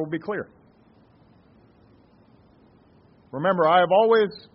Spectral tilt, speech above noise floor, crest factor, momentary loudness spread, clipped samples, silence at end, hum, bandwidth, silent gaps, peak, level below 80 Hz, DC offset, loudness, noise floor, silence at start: -3.5 dB/octave; 35 dB; 20 dB; 17 LU; under 0.1%; 0.15 s; none; 5.6 kHz; none; -6 dBFS; -68 dBFS; under 0.1%; -21 LUFS; -56 dBFS; 0 s